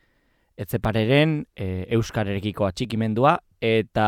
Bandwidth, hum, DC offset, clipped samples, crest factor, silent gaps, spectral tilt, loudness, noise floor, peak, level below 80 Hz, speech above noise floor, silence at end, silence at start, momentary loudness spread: 16 kHz; none; under 0.1%; under 0.1%; 18 dB; none; -6.5 dB/octave; -23 LUFS; -65 dBFS; -6 dBFS; -46 dBFS; 43 dB; 0 s; 0.6 s; 10 LU